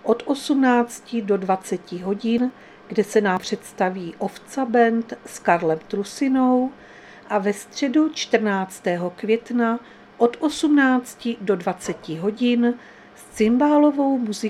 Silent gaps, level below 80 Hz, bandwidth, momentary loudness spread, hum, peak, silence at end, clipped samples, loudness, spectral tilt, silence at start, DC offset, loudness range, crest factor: none; -62 dBFS; 14 kHz; 11 LU; none; -2 dBFS; 0 s; under 0.1%; -22 LUFS; -5 dB/octave; 0.05 s; under 0.1%; 2 LU; 20 dB